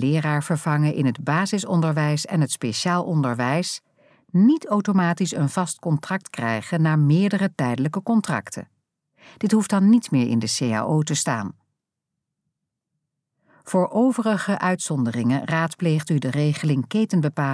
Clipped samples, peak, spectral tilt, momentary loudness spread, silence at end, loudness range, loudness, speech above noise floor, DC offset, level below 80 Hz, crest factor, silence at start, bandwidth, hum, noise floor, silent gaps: under 0.1%; -6 dBFS; -6 dB/octave; 7 LU; 0 s; 4 LU; -22 LUFS; 62 dB; under 0.1%; -72 dBFS; 16 dB; 0 s; 11 kHz; none; -83 dBFS; none